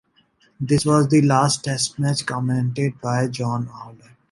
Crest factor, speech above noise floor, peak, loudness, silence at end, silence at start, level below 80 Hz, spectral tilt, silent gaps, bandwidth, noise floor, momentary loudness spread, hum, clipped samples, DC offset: 18 dB; 40 dB; -2 dBFS; -20 LUFS; 0.35 s; 0.6 s; -56 dBFS; -5.5 dB/octave; none; 11.5 kHz; -60 dBFS; 11 LU; none; under 0.1%; under 0.1%